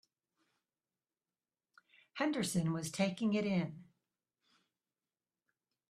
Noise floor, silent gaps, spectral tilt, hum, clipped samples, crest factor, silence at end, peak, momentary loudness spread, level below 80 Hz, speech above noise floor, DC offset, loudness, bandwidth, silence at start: under -90 dBFS; none; -5.5 dB/octave; none; under 0.1%; 20 dB; 2.05 s; -20 dBFS; 12 LU; -76 dBFS; over 55 dB; under 0.1%; -36 LUFS; 13 kHz; 2.15 s